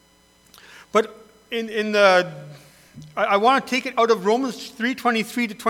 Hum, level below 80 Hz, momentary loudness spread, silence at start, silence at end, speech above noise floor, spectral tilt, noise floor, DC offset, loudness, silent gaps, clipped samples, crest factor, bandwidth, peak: none; -66 dBFS; 14 LU; 0.95 s; 0 s; 36 dB; -4 dB/octave; -56 dBFS; under 0.1%; -21 LUFS; none; under 0.1%; 20 dB; 18 kHz; -2 dBFS